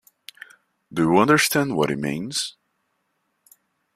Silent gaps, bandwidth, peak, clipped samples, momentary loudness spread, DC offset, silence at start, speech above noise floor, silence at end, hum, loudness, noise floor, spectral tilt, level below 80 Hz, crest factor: none; 15.5 kHz; -2 dBFS; under 0.1%; 16 LU; under 0.1%; 0.9 s; 52 dB; 1.45 s; none; -21 LUFS; -73 dBFS; -4 dB/octave; -60 dBFS; 22 dB